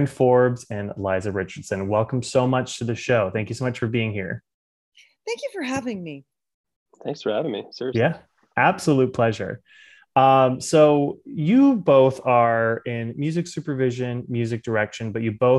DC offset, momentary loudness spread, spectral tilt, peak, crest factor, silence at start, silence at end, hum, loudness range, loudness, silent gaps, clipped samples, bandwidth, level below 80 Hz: under 0.1%; 14 LU; -6.5 dB/octave; -2 dBFS; 20 dB; 0 s; 0 s; none; 11 LU; -22 LUFS; 4.54-4.92 s, 6.54-6.64 s, 6.76-6.86 s; under 0.1%; 12 kHz; -60 dBFS